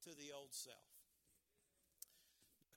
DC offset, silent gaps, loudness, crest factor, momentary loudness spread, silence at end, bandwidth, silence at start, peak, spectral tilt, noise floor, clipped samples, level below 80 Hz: under 0.1%; none; -56 LUFS; 28 dB; 16 LU; 0 s; 18 kHz; 0 s; -34 dBFS; -1.5 dB/octave; -83 dBFS; under 0.1%; under -90 dBFS